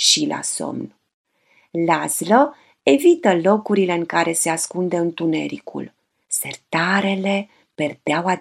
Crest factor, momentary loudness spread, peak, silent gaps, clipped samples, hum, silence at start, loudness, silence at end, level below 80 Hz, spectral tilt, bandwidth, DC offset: 20 dB; 14 LU; 0 dBFS; 1.14-1.24 s; under 0.1%; none; 0 s; -19 LUFS; 0 s; -72 dBFS; -3.5 dB/octave; 15.5 kHz; under 0.1%